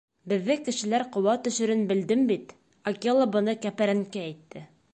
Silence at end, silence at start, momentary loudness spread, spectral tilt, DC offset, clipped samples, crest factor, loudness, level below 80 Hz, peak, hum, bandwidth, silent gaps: 0.3 s; 0.25 s; 12 LU; -5 dB/octave; under 0.1%; under 0.1%; 16 dB; -26 LUFS; -72 dBFS; -10 dBFS; none; 9 kHz; none